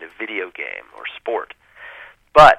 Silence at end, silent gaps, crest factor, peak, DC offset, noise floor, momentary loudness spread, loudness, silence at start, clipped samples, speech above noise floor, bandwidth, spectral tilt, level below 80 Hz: 0.05 s; none; 18 dB; 0 dBFS; under 0.1%; -41 dBFS; 22 LU; -20 LUFS; 0 s; under 0.1%; 14 dB; 12.5 kHz; -4 dB/octave; -44 dBFS